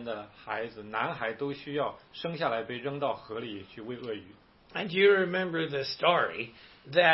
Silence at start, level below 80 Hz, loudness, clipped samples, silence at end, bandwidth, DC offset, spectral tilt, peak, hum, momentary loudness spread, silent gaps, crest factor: 0 s; -68 dBFS; -31 LUFS; under 0.1%; 0 s; 5.8 kHz; under 0.1%; -8 dB/octave; -8 dBFS; none; 15 LU; none; 22 dB